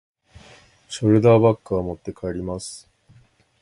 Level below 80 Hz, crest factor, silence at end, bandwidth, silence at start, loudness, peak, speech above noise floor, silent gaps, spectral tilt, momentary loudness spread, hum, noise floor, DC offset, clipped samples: -48 dBFS; 20 dB; 0.85 s; 11.5 kHz; 0.9 s; -20 LUFS; -2 dBFS; 36 dB; none; -7 dB/octave; 20 LU; none; -56 dBFS; under 0.1%; under 0.1%